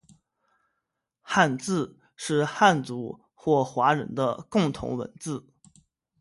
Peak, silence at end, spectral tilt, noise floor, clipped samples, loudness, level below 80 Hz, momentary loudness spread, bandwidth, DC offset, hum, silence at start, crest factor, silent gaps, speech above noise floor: -6 dBFS; 0.8 s; -5 dB/octave; -82 dBFS; under 0.1%; -26 LUFS; -60 dBFS; 14 LU; 11.5 kHz; under 0.1%; none; 1.25 s; 22 dB; none; 57 dB